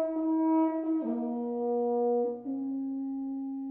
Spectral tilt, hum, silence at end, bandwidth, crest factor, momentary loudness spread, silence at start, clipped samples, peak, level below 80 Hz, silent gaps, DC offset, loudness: -8.5 dB/octave; none; 0 s; 2.7 kHz; 12 dB; 8 LU; 0 s; under 0.1%; -18 dBFS; -74 dBFS; none; under 0.1%; -31 LUFS